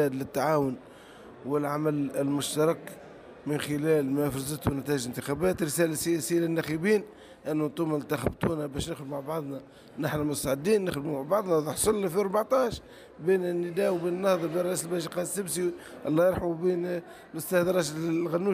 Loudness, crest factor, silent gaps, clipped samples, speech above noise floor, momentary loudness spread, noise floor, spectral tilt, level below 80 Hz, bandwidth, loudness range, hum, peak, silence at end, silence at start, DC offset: -29 LUFS; 16 dB; none; under 0.1%; 21 dB; 10 LU; -49 dBFS; -5 dB/octave; -54 dBFS; 15.5 kHz; 3 LU; none; -12 dBFS; 0 s; 0 s; under 0.1%